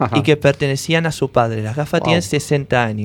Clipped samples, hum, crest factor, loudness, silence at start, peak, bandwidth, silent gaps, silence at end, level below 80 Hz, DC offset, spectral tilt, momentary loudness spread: under 0.1%; none; 16 dB; -17 LUFS; 0 s; 0 dBFS; 17.5 kHz; none; 0 s; -46 dBFS; under 0.1%; -5.5 dB/octave; 5 LU